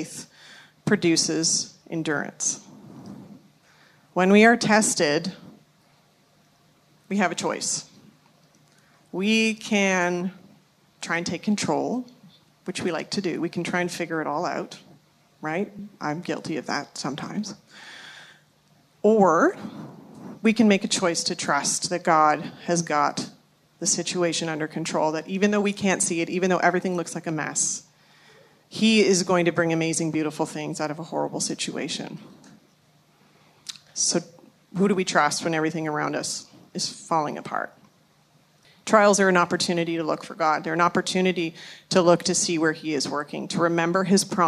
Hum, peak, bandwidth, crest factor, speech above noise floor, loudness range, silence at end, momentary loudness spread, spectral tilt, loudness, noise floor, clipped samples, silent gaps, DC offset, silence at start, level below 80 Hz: none; -2 dBFS; 13.5 kHz; 22 dB; 37 dB; 8 LU; 0 s; 17 LU; -3.5 dB/octave; -23 LUFS; -60 dBFS; under 0.1%; none; under 0.1%; 0 s; -72 dBFS